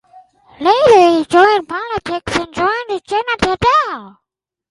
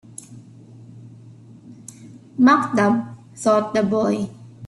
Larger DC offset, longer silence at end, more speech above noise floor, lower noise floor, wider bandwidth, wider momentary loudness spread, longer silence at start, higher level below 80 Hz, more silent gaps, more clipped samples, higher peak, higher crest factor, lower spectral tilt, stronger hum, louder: neither; first, 0.6 s vs 0 s; first, 68 dB vs 26 dB; first, -81 dBFS vs -44 dBFS; about the same, 11.5 kHz vs 11.5 kHz; second, 12 LU vs 25 LU; second, 0.15 s vs 0.3 s; first, -42 dBFS vs -62 dBFS; neither; neither; first, 0 dBFS vs -4 dBFS; about the same, 14 dB vs 18 dB; second, -4.5 dB/octave vs -6 dB/octave; neither; first, -14 LUFS vs -19 LUFS